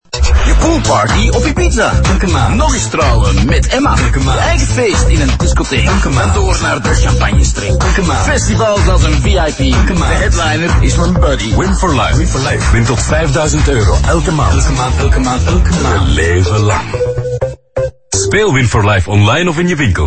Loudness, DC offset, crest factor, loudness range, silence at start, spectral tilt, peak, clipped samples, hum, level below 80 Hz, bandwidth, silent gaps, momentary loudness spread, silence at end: -11 LUFS; under 0.1%; 10 dB; 1 LU; 0.15 s; -5 dB/octave; 0 dBFS; under 0.1%; none; -14 dBFS; 8.8 kHz; none; 3 LU; 0 s